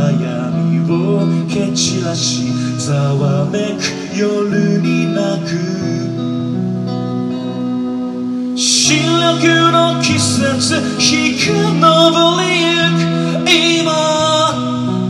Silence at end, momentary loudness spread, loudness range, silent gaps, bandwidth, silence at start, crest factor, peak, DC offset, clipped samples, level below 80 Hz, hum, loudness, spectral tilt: 0 s; 9 LU; 6 LU; none; 12.5 kHz; 0 s; 14 dB; 0 dBFS; under 0.1%; under 0.1%; -54 dBFS; none; -14 LUFS; -4 dB/octave